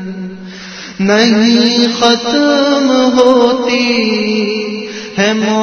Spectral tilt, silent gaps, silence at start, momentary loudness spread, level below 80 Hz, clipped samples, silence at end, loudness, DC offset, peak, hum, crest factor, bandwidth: -4 dB/octave; none; 0 s; 16 LU; -52 dBFS; 0.2%; 0 s; -11 LUFS; under 0.1%; 0 dBFS; none; 12 dB; 6.8 kHz